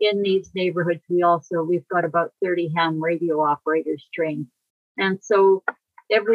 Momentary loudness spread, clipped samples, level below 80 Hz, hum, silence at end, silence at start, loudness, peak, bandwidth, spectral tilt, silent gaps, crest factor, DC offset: 8 LU; under 0.1%; -74 dBFS; none; 0 s; 0 s; -22 LUFS; -6 dBFS; 7.2 kHz; -6.5 dB/octave; 4.70-4.95 s; 16 dB; under 0.1%